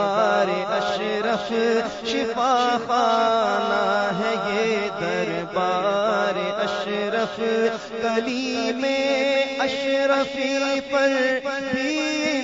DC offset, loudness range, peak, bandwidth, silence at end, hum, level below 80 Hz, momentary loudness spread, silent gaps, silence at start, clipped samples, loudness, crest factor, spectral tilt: under 0.1%; 2 LU; -6 dBFS; 7.8 kHz; 0 s; none; -62 dBFS; 5 LU; none; 0 s; under 0.1%; -22 LUFS; 16 dB; -4 dB/octave